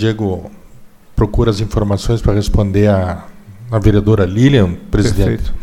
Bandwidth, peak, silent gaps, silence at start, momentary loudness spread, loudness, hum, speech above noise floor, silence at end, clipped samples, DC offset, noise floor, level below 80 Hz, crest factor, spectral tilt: 13.5 kHz; 0 dBFS; none; 0 s; 9 LU; -14 LUFS; none; 25 dB; 0 s; under 0.1%; under 0.1%; -38 dBFS; -22 dBFS; 14 dB; -7.5 dB/octave